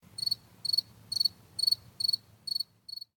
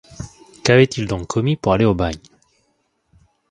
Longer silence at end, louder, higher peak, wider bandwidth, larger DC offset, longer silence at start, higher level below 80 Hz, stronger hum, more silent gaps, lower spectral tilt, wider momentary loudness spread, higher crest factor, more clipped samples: second, 0.15 s vs 1.35 s; second, -30 LUFS vs -18 LUFS; second, -14 dBFS vs 0 dBFS; first, 18.5 kHz vs 11 kHz; neither; about the same, 0.2 s vs 0.1 s; second, -72 dBFS vs -40 dBFS; neither; neither; second, 0 dB/octave vs -6 dB/octave; second, 8 LU vs 22 LU; about the same, 20 dB vs 20 dB; neither